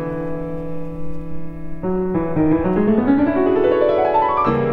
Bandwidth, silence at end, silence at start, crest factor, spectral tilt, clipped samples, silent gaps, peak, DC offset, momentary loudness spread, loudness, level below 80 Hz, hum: 5.4 kHz; 0 s; 0 s; 16 dB; -10 dB/octave; under 0.1%; none; -2 dBFS; under 0.1%; 15 LU; -18 LUFS; -38 dBFS; none